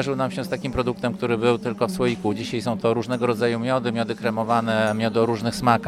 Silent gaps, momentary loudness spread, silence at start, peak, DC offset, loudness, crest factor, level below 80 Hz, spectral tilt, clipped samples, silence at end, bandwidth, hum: none; 5 LU; 0 s; -4 dBFS; under 0.1%; -23 LUFS; 18 dB; -50 dBFS; -6 dB/octave; under 0.1%; 0 s; 15 kHz; none